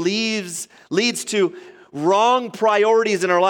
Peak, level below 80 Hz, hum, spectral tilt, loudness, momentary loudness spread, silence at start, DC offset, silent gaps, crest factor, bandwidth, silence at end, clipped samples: -4 dBFS; -74 dBFS; none; -3.5 dB/octave; -19 LUFS; 10 LU; 0 s; under 0.1%; none; 14 dB; 17 kHz; 0 s; under 0.1%